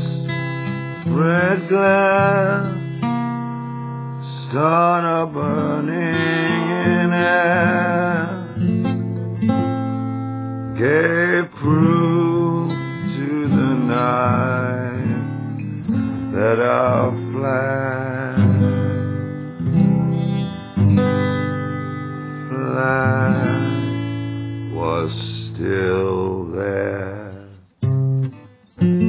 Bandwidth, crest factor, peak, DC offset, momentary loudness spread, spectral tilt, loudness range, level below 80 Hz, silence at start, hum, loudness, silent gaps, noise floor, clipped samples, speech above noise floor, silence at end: 4 kHz; 16 dB; -2 dBFS; under 0.1%; 11 LU; -11.5 dB/octave; 4 LU; -44 dBFS; 0 s; none; -19 LUFS; none; -42 dBFS; under 0.1%; 26 dB; 0 s